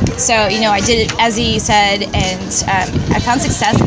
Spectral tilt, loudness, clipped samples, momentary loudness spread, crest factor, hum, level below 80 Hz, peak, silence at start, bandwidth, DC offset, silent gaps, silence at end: -3.5 dB/octave; -13 LUFS; under 0.1%; 4 LU; 14 dB; none; -28 dBFS; 0 dBFS; 0 s; 8 kHz; under 0.1%; none; 0 s